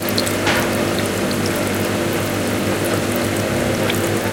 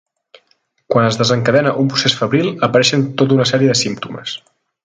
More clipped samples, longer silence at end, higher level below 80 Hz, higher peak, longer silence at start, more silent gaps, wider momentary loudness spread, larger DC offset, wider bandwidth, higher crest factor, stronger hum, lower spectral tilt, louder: neither; second, 0 s vs 0.45 s; first, -42 dBFS vs -56 dBFS; about the same, 0 dBFS vs 0 dBFS; second, 0 s vs 0.9 s; neither; second, 2 LU vs 12 LU; neither; first, 17.5 kHz vs 9.6 kHz; about the same, 18 dB vs 16 dB; neither; about the same, -4.5 dB/octave vs -4.5 dB/octave; second, -19 LUFS vs -14 LUFS